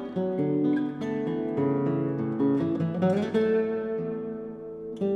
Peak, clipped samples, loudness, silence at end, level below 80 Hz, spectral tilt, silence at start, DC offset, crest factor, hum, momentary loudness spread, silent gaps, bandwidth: -14 dBFS; under 0.1%; -27 LUFS; 0 s; -66 dBFS; -9.5 dB/octave; 0 s; under 0.1%; 14 dB; none; 10 LU; none; 8.2 kHz